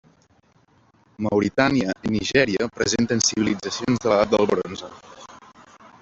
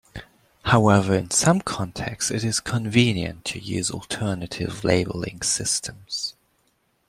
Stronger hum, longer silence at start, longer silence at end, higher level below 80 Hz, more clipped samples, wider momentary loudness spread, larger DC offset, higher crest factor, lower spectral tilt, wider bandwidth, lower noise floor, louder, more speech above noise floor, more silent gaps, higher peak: neither; first, 1.2 s vs 0.15 s; second, 0.65 s vs 0.8 s; about the same, -52 dBFS vs -50 dBFS; neither; about the same, 10 LU vs 11 LU; neither; about the same, 20 dB vs 20 dB; about the same, -4 dB/octave vs -4 dB/octave; second, 8.2 kHz vs 15.5 kHz; second, -59 dBFS vs -67 dBFS; about the same, -21 LUFS vs -23 LUFS; second, 38 dB vs 44 dB; neither; about the same, -4 dBFS vs -2 dBFS